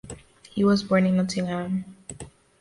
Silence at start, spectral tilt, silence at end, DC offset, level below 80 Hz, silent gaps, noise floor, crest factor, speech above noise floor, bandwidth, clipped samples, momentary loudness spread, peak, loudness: 0.05 s; -6.5 dB/octave; 0.3 s; under 0.1%; -56 dBFS; none; -44 dBFS; 16 dB; 22 dB; 11.5 kHz; under 0.1%; 22 LU; -10 dBFS; -24 LUFS